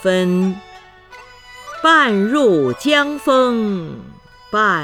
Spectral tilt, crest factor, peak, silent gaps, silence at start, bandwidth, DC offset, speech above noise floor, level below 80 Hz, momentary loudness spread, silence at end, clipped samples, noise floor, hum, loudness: -5.5 dB/octave; 16 dB; 0 dBFS; none; 0 s; 15 kHz; under 0.1%; 26 dB; -54 dBFS; 19 LU; 0 s; under 0.1%; -41 dBFS; 50 Hz at -40 dBFS; -15 LUFS